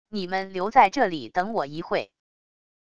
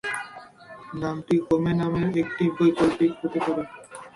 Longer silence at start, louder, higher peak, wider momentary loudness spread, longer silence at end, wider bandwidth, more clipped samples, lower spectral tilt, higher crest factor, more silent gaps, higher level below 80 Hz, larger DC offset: about the same, 0.05 s vs 0.05 s; about the same, -24 LUFS vs -24 LUFS; first, -4 dBFS vs -8 dBFS; second, 10 LU vs 19 LU; first, 0.65 s vs 0.05 s; second, 7.8 kHz vs 11.5 kHz; neither; second, -5 dB/octave vs -7 dB/octave; first, 22 dB vs 16 dB; neither; second, -60 dBFS vs -54 dBFS; first, 0.5% vs under 0.1%